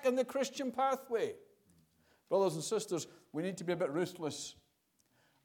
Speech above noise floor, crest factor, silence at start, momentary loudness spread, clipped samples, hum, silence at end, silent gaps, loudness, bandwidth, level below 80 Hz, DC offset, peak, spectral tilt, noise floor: 40 dB; 18 dB; 0 s; 9 LU; under 0.1%; none; 0.9 s; none; -36 LUFS; 18 kHz; -82 dBFS; under 0.1%; -20 dBFS; -4.5 dB/octave; -76 dBFS